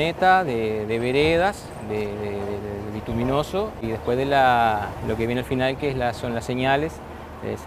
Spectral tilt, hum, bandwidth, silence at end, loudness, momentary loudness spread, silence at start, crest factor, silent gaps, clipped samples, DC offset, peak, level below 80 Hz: -6 dB/octave; none; 15.5 kHz; 0 s; -23 LUFS; 12 LU; 0 s; 18 dB; none; under 0.1%; under 0.1%; -4 dBFS; -44 dBFS